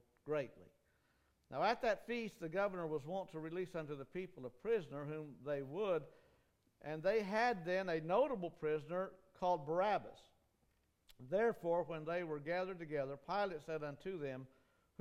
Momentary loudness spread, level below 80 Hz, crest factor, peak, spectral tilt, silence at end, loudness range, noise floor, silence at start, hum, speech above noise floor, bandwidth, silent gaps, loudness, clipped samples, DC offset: 11 LU; -72 dBFS; 18 dB; -24 dBFS; -6.5 dB/octave; 0.55 s; 5 LU; -79 dBFS; 0.25 s; none; 38 dB; 15 kHz; none; -41 LUFS; under 0.1%; under 0.1%